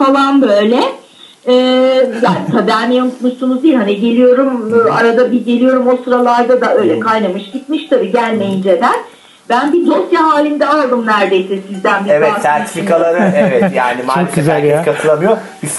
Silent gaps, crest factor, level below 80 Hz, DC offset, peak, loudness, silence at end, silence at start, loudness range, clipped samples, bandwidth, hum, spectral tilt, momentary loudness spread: none; 10 dB; -60 dBFS; under 0.1%; 0 dBFS; -11 LUFS; 0 s; 0 s; 2 LU; under 0.1%; 12 kHz; none; -5.5 dB/octave; 5 LU